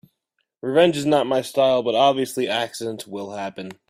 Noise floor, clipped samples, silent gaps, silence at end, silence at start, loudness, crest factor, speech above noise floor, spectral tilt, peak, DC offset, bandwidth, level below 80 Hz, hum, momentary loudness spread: -75 dBFS; under 0.1%; none; 0.15 s; 0.65 s; -21 LUFS; 18 dB; 54 dB; -4.5 dB/octave; -4 dBFS; under 0.1%; 16 kHz; -64 dBFS; none; 14 LU